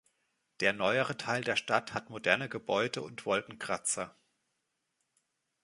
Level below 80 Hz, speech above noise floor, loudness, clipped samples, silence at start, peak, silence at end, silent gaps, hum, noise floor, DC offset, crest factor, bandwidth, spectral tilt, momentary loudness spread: -72 dBFS; 50 dB; -32 LUFS; under 0.1%; 0.6 s; -8 dBFS; 1.55 s; none; none; -82 dBFS; under 0.1%; 26 dB; 11.5 kHz; -3 dB/octave; 7 LU